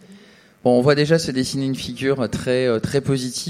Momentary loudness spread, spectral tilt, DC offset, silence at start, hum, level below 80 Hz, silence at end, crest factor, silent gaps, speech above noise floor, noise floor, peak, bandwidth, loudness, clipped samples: 8 LU; -5.5 dB/octave; under 0.1%; 0.1 s; none; -50 dBFS; 0 s; 18 dB; none; 29 dB; -48 dBFS; -2 dBFS; 15 kHz; -20 LUFS; under 0.1%